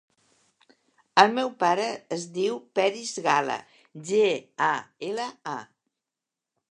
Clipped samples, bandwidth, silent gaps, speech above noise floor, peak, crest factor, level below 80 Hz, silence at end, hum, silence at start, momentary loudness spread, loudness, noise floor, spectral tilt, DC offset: under 0.1%; 11 kHz; none; 63 dB; -2 dBFS; 26 dB; -82 dBFS; 1.1 s; none; 1.15 s; 14 LU; -26 LUFS; -88 dBFS; -3.5 dB/octave; under 0.1%